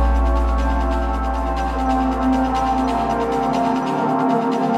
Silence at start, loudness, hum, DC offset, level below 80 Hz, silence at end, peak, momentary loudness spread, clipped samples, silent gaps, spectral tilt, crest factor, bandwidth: 0 s; -20 LUFS; none; under 0.1%; -24 dBFS; 0 s; -6 dBFS; 4 LU; under 0.1%; none; -7 dB/octave; 12 dB; 10 kHz